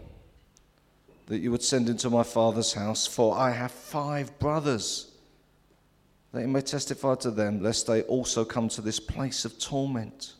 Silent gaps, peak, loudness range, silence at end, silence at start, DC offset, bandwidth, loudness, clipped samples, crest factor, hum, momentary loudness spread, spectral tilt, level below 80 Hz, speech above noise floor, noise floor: none; -10 dBFS; 4 LU; 0.05 s; 0 s; under 0.1%; 15 kHz; -28 LUFS; under 0.1%; 18 dB; none; 8 LU; -4 dB/octave; -54 dBFS; 36 dB; -64 dBFS